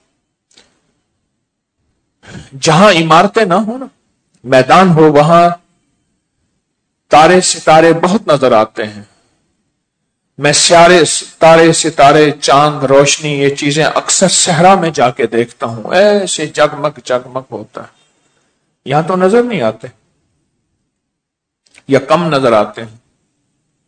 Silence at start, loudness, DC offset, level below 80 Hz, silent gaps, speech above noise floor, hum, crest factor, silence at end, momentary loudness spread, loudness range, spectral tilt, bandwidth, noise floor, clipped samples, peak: 2.3 s; -9 LUFS; under 0.1%; -48 dBFS; none; 66 dB; none; 12 dB; 1 s; 13 LU; 9 LU; -4 dB/octave; 11 kHz; -75 dBFS; 2%; 0 dBFS